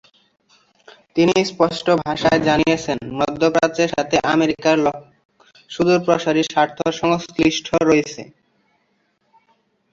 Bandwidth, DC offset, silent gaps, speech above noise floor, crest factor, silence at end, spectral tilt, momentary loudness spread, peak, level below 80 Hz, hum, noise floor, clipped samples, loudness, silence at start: 7.8 kHz; under 0.1%; 5.25-5.29 s; 48 dB; 18 dB; 1.7 s; -5 dB/octave; 6 LU; -2 dBFS; -50 dBFS; none; -66 dBFS; under 0.1%; -18 LUFS; 1.15 s